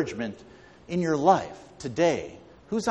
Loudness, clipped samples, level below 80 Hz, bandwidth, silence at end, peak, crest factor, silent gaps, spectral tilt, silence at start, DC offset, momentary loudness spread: -26 LUFS; under 0.1%; -58 dBFS; 11.5 kHz; 0 s; -6 dBFS; 22 dB; none; -5.5 dB/octave; 0 s; under 0.1%; 18 LU